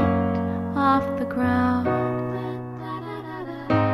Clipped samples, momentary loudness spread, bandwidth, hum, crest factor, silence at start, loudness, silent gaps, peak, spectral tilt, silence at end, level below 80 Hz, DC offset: under 0.1%; 13 LU; 12.5 kHz; none; 16 dB; 0 s; -25 LUFS; none; -8 dBFS; -9 dB/octave; 0 s; -50 dBFS; under 0.1%